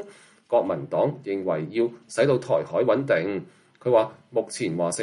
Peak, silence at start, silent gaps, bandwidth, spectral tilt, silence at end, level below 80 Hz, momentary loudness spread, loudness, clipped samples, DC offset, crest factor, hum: -8 dBFS; 0 s; none; 11.5 kHz; -5.5 dB/octave; 0 s; -68 dBFS; 7 LU; -25 LUFS; under 0.1%; under 0.1%; 16 dB; none